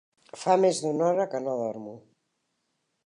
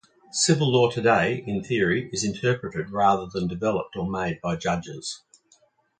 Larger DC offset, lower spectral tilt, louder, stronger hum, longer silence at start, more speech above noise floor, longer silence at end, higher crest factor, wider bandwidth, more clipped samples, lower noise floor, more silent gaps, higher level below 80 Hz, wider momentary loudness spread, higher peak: neither; about the same, -5 dB/octave vs -4.5 dB/octave; about the same, -26 LUFS vs -24 LUFS; neither; about the same, 0.35 s vs 0.35 s; first, 51 dB vs 38 dB; first, 1.05 s vs 0.85 s; about the same, 18 dB vs 20 dB; first, 11 kHz vs 9.4 kHz; neither; first, -77 dBFS vs -62 dBFS; neither; second, -82 dBFS vs -54 dBFS; first, 14 LU vs 10 LU; second, -10 dBFS vs -6 dBFS